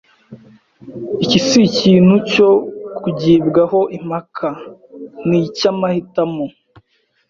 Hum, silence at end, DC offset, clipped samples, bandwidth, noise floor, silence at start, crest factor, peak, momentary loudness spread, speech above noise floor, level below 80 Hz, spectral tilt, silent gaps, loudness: none; 0.8 s; under 0.1%; under 0.1%; 7.4 kHz; -60 dBFS; 0.3 s; 16 dB; 0 dBFS; 17 LU; 45 dB; -52 dBFS; -6 dB/octave; none; -15 LUFS